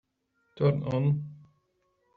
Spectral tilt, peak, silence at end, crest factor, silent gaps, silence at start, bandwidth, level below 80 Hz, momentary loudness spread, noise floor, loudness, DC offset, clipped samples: -9 dB/octave; -12 dBFS; 0.8 s; 18 dB; none; 0.55 s; 4.7 kHz; -62 dBFS; 7 LU; -75 dBFS; -28 LUFS; under 0.1%; under 0.1%